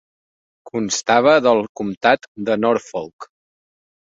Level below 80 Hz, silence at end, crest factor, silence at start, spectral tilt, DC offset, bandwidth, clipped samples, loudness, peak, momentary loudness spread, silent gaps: -60 dBFS; 0.9 s; 18 dB; 0.65 s; -3.5 dB/octave; under 0.1%; 7.8 kHz; under 0.1%; -17 LUFS; -2 dBFS; 16 LU; 1.69-1.75 s, 1.97-2.01 s, 2.28-2.35 s, 3.13-3.19 s